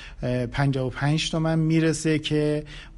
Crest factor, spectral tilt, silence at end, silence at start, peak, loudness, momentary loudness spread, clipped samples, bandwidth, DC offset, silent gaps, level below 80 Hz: 14 dB; -6 dB/octave; 0 s; 0 s; -10 dBFS; -24 LUFS; 5 LU; under 0.1%; 11.5 kHz; under 0.1%; none; -44 dBFS